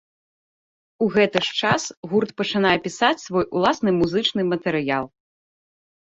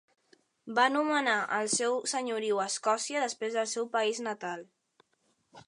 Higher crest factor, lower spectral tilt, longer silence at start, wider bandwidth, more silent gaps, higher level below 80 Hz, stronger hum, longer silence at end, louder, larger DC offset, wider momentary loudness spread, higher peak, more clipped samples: about the same, 20 dB vs 22 dB; first, -4.5 dB/octave vs -1.5 dB/octave; first, 1 s vs 0.65 s; second, 8 kHz vs 11.5 kHz; first, 1.97-2.03 s vs none; first, -56 dBFS vs -86 dBFS; neither; first, 1.05 s vs 0.05 s; first, -21 LUFS vs -30 LUFS; neither; second, 5 LU vs 8 LU; first, -2 dBFS vs -10 dBFS; neither